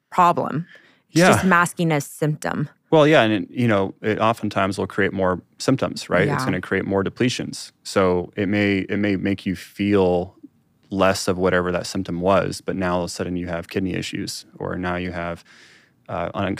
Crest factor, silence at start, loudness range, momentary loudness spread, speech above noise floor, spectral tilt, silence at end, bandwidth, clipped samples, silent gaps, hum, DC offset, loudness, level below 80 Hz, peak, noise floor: 18 dB; 0.1 s; 6 LU; 12 LU; 29 dB; -5.5 dB/octave; 0 s; 16 kHz; under 0.1%; none; none; under 0.1%; -21 LUFS; -54 dBFS; -2 dBFS; -49 dBFS